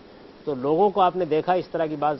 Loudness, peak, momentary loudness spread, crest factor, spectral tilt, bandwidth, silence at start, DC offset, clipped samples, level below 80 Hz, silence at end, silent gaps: -23 LUFS; -8 dBFS; 10 LU; 16 dB; -9 dB/octave; 6 kHz; 0.25 s; under 0.1%; under 0.1%; -60 dBFS; 0 s; none